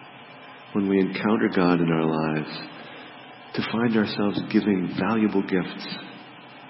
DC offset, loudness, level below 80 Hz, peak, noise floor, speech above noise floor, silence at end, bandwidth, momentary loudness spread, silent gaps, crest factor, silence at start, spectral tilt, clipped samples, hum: under 0.1%; -24 LUFS; -64 dBFS; -6 dBFS; -44 dBFS; 21 dB; 0 s; 5.8 kHz; 21 LU; none; 18 dB; 0 s; -10 dB/octave; under 0.1%; none